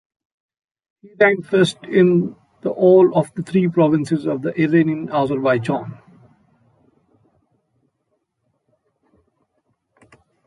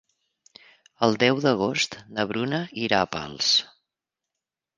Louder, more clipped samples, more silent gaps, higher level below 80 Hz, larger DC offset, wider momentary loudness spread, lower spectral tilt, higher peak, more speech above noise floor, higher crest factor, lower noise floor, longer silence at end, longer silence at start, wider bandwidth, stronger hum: first, -17 LUFS vs -24 LUFS; neither; neither; about the same, -62 dBFS vs -62 dBFS; neither; first, 11 LU vs 8 LU; first, -7.5 dB/octave vs -3.5 dB/octave; about the same, -2 dBFS vs -2 dBFS; second, 55 dB vs 63 dB; second, 18 dB vs 24 dB; second, -71 dBFS vs -87 dBFS; first, 4.55 s vs 1.1 s; first, 1.2 s vs 1 s; first, 11.5 kHz vs 10 kHz; neither